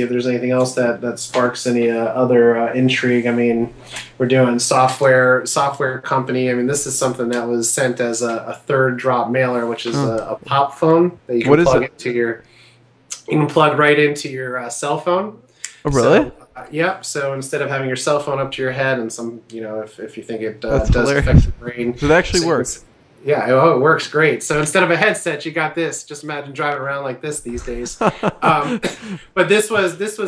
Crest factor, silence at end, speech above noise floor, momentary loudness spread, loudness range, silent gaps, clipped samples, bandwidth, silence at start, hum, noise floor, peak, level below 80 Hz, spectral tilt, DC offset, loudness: 18 dB; 0 s; 33 dB; 13 LU; 5 LU; none; under 0.1%; 11 kHz; 0 s; none; -50 dBFS; 0 dBFS; -34 dBFS; -5 dB/octave; under 0.1%; -17 LUFS